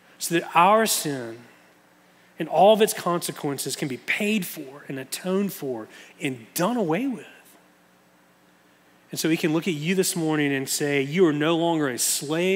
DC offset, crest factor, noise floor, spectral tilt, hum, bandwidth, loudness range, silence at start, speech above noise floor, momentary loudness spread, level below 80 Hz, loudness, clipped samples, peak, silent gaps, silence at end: under 0.1%; 20 dB; -58 dBFS; -4 dB/octave; none; 16.5 kHz; 7 LU; 0.2 s; 35 dB; 16 LU; -82 dBFS; -23 LUFS; under 0.1%; -4 dBFS; none; 0 s